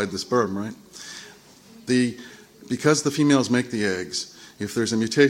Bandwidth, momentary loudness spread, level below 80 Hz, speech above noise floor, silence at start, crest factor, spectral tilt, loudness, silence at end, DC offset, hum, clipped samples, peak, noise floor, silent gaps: 16.5 kHz; 19 LU; -64 dBFS; 26 dB; 0 s; 20 dB; -4.5 dB/octave; -23 LUFS; 0 s; under 0.1%; none; under 0.1%; -2 dBFS; -49 dBFS; none